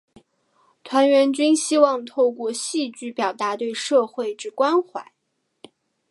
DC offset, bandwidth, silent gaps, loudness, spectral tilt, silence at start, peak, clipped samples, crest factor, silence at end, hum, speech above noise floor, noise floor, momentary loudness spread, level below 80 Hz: under 0.1%; 11.5 kHz; none; -21 LUFS; -2.5 dB/octave; 0.85 s; -2 dBFS; under 0.1%; 20 dB; 1.1 s; none; 43 dB; -63 dBFS; 11 LU; -78 dBFS